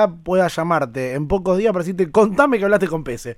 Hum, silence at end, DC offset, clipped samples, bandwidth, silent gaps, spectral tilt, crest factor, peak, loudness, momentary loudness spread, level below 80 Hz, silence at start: none; 0.05 s; under 0.1%; under 0.1%; 15 kHz; none; -6.5 dB/octave; 18 dB; 0 dBFS; -18 LUFS; 8 LU; -42 dBFS; 0 s